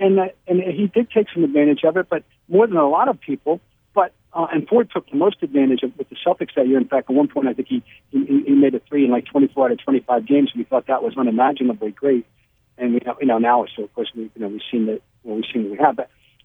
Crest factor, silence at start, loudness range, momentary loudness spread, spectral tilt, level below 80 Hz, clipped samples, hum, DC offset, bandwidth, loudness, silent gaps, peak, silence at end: 16 dB; 0 s; 3 LU; 10 LU; -9.5 dB/octave; -66 dBFS; under 0.1%; none; under 0.1%; 3.8 kHz; -19 LUFS; none; -2 dBFS; 0.4 s